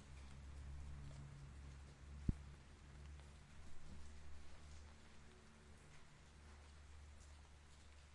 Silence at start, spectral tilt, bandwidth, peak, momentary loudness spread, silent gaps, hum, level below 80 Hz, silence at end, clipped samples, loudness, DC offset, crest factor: 0 s; -6 dB/octave; 11 kHz; -24 dBFS; 10 LU; none; none; -58 dBFS; 0 s; under 0.1%; -58 LUFS; under 0.1%; 32 dB